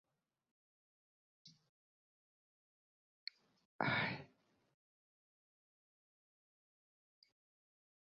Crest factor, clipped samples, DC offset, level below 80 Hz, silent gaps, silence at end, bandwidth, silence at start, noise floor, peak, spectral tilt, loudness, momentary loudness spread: 32 dB; under 0.1%; under 0.1%; -82 dBFS; 1.69-3.27 s, 3.65-3.79 s; 3.85 s; 6.8 kHz; 1.45 s; -73 dBFS; -20 dBFS; -2.5 dB/octave; -40 LUFS; 16 LU